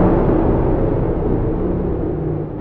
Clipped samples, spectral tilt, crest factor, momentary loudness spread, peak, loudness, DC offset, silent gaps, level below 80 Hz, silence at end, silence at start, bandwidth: under 0.1%; -12.5 dB/octave; 14 dB; 6 LU; -2 dBFS; -18 LUFS; under 0.1%; none; -24 dBFS; 0 s; 0 s; 3.9 kHz